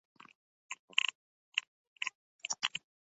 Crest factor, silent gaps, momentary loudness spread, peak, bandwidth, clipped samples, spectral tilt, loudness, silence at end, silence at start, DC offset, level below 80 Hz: 34 dB; 0.79-0.88 s, 1.15-1.52 s, 1.67-1.96 s, 2.15-2.39 s; 14 LU; -8 dBFS; 8 kHz; under 0.1%; 4.5 dB/octave; -37 LUFS; 0.25 s; 0.7 s; under 0.1%; under -90 dBFS